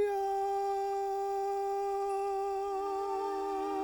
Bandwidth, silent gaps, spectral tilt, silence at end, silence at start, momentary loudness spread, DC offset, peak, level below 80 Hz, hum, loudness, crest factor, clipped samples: 19 kHz; none; -4 dB/octave; 0 s; 0 s; 2 LU; under 0.1%; -24 dBFS; -66 dBFS; none; -34 LUFS; 10 dB; under 0.1%